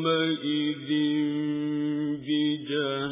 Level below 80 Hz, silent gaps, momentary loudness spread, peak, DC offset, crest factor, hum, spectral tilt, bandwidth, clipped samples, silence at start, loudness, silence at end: -72 dBFS; none; 4 LU; -14 dBFS; under 0.1%; 14 dB; none; -4 dB/octave; 3.8 kHz; under 0.1%; 0 s; -27 LUFS; 0 s